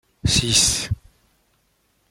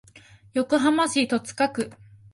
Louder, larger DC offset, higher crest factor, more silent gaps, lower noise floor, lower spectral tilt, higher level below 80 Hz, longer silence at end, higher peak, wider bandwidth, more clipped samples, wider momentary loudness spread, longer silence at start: first, -18 LUFS vs -24 LUFS; neither; about the same, 22 dB vs 18 dB; neither; first, -65 dBFS vs -51 dBFS; second, -2 dB/octave vs -3.5 dB/octave; first, -38 dBFS vs -62 dBFS; first, 1.15 s vs 0.4 s; first, -2 dBFS vs -8 dBFS; first, 16.5 kHz vs 11.5 kHz; neither; first, 14 LU vs 10 LU; second, 0.25 s vs 0.55 s